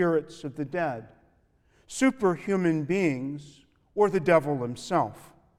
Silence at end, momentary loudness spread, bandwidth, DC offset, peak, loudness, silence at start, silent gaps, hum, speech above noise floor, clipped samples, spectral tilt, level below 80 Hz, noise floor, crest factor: 0.35 s; 14 LU; 14 kHz; under 0.1%; -8 dBFS; -27 LUFS; 0 s; none; none; 38 dB; under 0.1%; -6.5 dB/octave; -62 dBFS; -65 dBFS; 18 dB